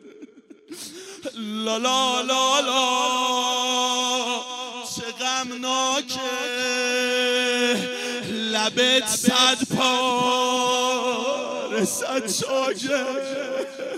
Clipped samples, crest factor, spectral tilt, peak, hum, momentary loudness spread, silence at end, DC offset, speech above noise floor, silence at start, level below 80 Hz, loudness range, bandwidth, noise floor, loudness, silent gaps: under 0.1%; 20 dB; -1.5 dB/octave; -4 dBFS; none; 11 LU; 0 s; under 0.1%; 24 dB; 0.05 s; -70 dBFS; 4 LU; 16 kHz; -46 dBFS; -22 LUFS; none